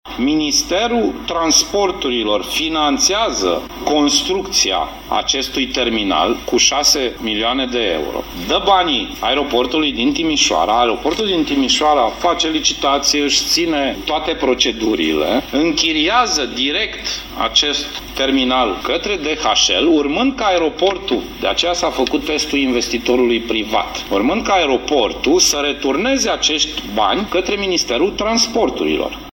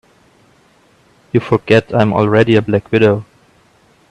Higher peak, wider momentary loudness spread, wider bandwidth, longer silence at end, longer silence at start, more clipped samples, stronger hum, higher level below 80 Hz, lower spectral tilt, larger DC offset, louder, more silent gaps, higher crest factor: about the same, 0 dBFS vs 0 dBFS; about the same, 6 LU vs 7 LU; first, 17 kHz vs 9.4 kHz; second, 0 s vs 0.85 s; second, 0.05 s vs 1.35 s; neither; neither; first, -38 dBFS vs -48 dBFS; second, -2 dB/octave vs -8 dB/octave; neither; about the same, -15 LUFS vs -13 LUFS; neither; about the same, 16 dB vs 16 dB